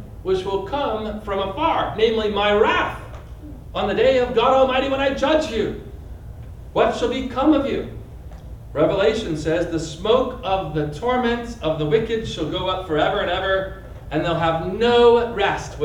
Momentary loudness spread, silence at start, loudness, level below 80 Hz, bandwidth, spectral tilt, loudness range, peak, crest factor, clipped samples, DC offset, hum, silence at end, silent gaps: 19 LU; 0 s; -20 LUFS; -38 dBFS; 11 kHz; -5.5 dB/octave; 3 LU; -4 dBFS; 18 dB; under 0.1%; under 0.1%; none; 0 s; none